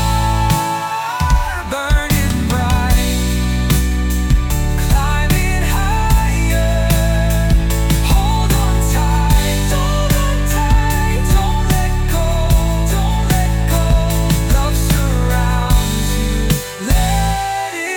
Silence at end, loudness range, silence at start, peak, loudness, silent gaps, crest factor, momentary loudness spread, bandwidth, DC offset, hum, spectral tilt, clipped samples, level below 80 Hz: 0 s; 1 LU; 0 s; -2 dBFS; -16 LUFS; none; 12 dB; 3 LU; 18 kHz; under 0.1%; none; -5 dB/octave; under 0.1%; -16 dBFS